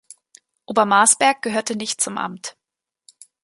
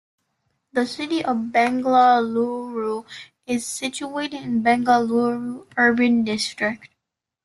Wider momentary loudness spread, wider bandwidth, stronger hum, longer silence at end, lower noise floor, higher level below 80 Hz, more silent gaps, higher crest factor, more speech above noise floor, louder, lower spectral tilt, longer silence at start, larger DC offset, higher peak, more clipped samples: first, 15 LU vs 11 LU; about the same, 12 kHz vs 12.5 kHz; neither; first, 0.95 s vs 0.6 s; about the same, -85 dBFS vs -82 dBFS; second, -72 dBFS vs -64 dBFS; neither; first, 22 dB vs 16 dB; first, 66 dB vs 62 dB; first, -18 LUFS vs -21 LUFS; second, -1.5 dB/octave vs -4 dB/octave; about the same, 0.7 s vs 0.75 s; neither; first, 0 dBFS vs -6 dBFS; neither